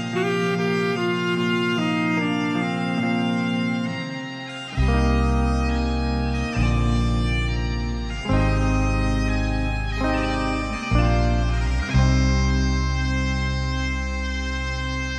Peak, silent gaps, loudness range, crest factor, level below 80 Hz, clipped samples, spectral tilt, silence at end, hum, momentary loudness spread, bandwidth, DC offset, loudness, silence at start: -6 dBFS; none; 2 LU; 16 dB; -26 dBFS; under 0.1%; -6 dB/octave; 0 s; none; 6 LU; 9.4 kHz; under 0.1%; -23 LUFS; 0 s